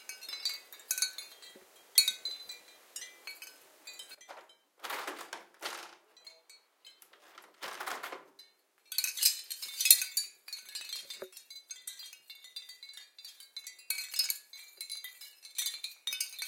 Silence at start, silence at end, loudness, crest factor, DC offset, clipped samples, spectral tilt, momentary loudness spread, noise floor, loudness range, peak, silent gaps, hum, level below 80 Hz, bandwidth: 0 s; 0 s; -32 LUFS; 38 dB; under 0.1%; under 0.1%; 4 dB/octave; 22 LU; -65 dBFS; 15 LU; -2 dBFS; none; none; under -90 dBFS; 17 kHz